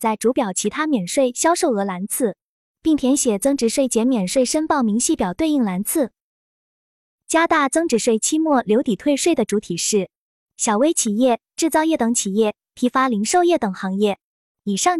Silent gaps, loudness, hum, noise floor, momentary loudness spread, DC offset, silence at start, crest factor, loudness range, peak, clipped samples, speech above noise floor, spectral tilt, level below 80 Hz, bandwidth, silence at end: 2.41-2.75 s, 6.21-7.19 s, 10.16-10.47 s, 14.23-14.55 s; -19 LUFS; none; under -90 dBFS; 5 LU; under 0.1%; 0 s; 16 dB; 2 LU; -4 dBFS; under 0.1%; over 71 dB; -4 dB/octave; -56 dBFS; 15 kHz; 0 s